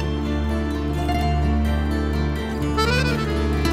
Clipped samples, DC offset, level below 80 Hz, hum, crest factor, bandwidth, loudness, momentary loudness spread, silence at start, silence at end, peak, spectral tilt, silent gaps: under 0.1%; under 0.1%; -24 dBFS; none; 14 dB; 14.5 kHz; -22 LUFS; 4 LU; 0 s; 0 s; -6 dBFS; -6.5 dB/octave; none